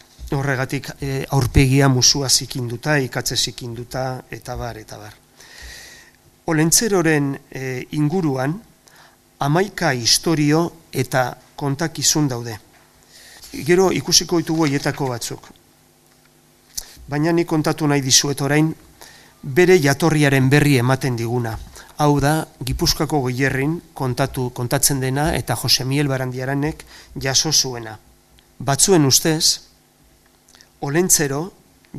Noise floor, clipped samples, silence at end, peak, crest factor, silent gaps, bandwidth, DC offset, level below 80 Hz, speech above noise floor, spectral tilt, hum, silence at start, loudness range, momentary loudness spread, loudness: -54 dBFS; under 0.1%; 0 s; 0 dBFS; 20 dB; none; 15.5 kHz; under 0.1%; -38 dBFS; 35 dB; -4 dB/octave; none; 0.2 s; 5 LU; 17 LU; -18 LUFS